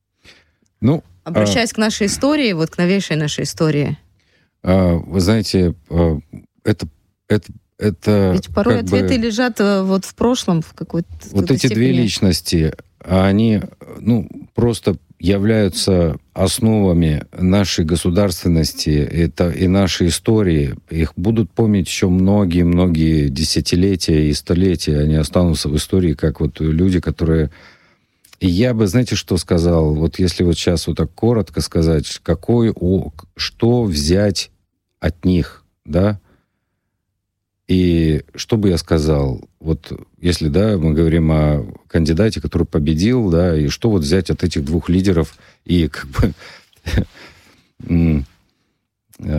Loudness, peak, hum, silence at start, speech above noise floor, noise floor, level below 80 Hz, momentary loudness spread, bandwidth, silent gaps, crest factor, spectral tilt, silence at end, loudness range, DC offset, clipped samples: -17 LUFS; -4 dBFS; none; 0.8 s; 59 dB; -75 dBFS; -30 dBFS; 7 LU; 16 kHz; none; 14 dB; -6 dB/octave; 0 s; 3 LU; under 0.1%; under 0.1%